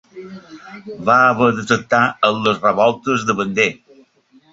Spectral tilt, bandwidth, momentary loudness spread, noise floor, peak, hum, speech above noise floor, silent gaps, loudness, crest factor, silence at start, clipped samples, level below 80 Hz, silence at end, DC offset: -5 dB/octave; 8 kHz; 23 LU; -53 dBFS; -2 dBFS; none; 36 dB; none; -16 LUFS; 16 dB; 0.15 s; under 0.1%; -56 dBFS; 0.8 s; under 0.1%